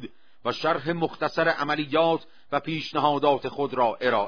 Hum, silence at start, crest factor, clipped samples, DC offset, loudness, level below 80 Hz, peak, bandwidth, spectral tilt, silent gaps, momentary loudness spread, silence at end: none; 0 s; 18 dB; under 0.1%; 0.4%; -25 LUFS; -66 dBFS; -8 dBFS; 5.4 kHz; -6 dB/octave; none; 8 LU; 0 s